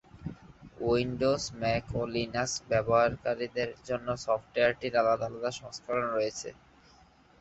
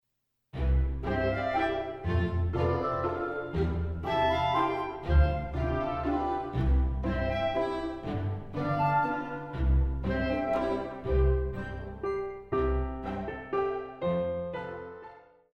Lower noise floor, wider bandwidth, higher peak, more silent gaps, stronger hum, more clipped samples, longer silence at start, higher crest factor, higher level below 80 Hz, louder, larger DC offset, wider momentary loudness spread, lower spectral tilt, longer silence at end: second, -60 dBFS vs -80 dBFS; first, 8.2 kHz vs 6 kHz; about the same, -12 dBFS vs -14 dBFS; neither; neither; neither; second, 0.15 s vs 0.55 s; about the same, 18 dB vs 16 dB; second, -54 dBFS vs -34 dBFS; about the same, -30 LUFS vs -30 LUFS; neither; about the same, 9 LU vs 9 LU; second, -4.5 dB/octave vs -8.5 dB/octave; first, 0.85 s vs 0.35 s